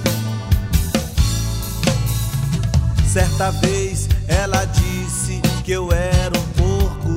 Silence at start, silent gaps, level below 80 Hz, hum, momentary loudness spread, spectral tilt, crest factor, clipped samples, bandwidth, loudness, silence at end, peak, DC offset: 0 s; none; -22 dBFS; none; 4 LU; -5 dB/octave; 18 dB; under 0.1%; 16.5 kHz; -19 LUFS; 0 s; 0 dBFS; under 0.1%